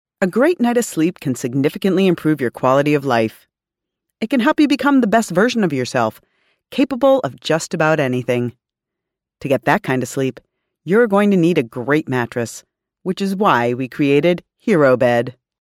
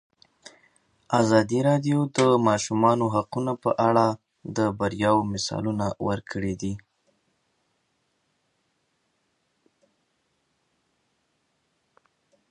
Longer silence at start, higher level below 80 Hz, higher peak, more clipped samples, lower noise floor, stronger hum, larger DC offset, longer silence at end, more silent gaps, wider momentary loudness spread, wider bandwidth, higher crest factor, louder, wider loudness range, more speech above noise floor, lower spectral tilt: second, 0.2 s vs 1.1 s; about the same, -60 dBFS vs -58 dBFS; first, 0 dBFS vs -4 dBFS; neither; first, -84 dBFS vs -73 dBFS; neither; neither; second, 0.3 s vs 5.75 s; neither; about the same, 9 LU vs 9 LU; first, 16 kHz vs 11 kHz; about the same, 18 dB vs 22 dB; first, -17 LUFS vs -24 LUFS; second, 3 LU vs 13 LU; first, 67 dB vs 50 dB; about the same, -6 dB/octave vs -6 dB/octave